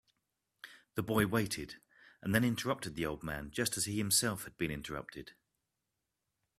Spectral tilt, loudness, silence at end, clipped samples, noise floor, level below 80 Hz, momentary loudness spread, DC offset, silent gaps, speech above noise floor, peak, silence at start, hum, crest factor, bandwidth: -3.5 dB/octave; -35 LUFS; 1.3 s; under 0.1%; -87 dBFS; -60 dBFS; 21 LU; under 0.1%; none; 52 dB; -12 dBFS; 0.65 s; none; 26 dB; 16 kHz